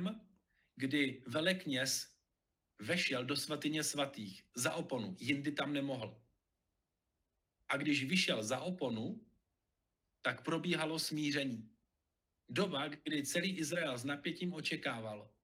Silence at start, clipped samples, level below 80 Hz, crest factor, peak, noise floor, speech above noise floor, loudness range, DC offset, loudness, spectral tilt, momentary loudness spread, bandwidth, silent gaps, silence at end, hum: 0 s; under 0.1%; -80 dBFS; 20 dB; -20 dBFS; -87 dBFS; 49 dB; 3 LU; under 0.1%; -38 LUFS; -3.5 dB/octave; 9 LU; 16.5 kHz; none; 0.15 s; none